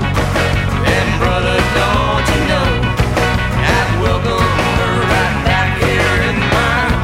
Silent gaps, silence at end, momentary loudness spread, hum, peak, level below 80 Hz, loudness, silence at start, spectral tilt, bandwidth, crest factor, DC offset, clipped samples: none; 0 s; 2 LU; none; 0 dBFS; -22 dBFS; -14 LUFS; 0 s; -5.5 dB/octave; 16.5 kHz; 12 dB; under 0.1%; under 0.1%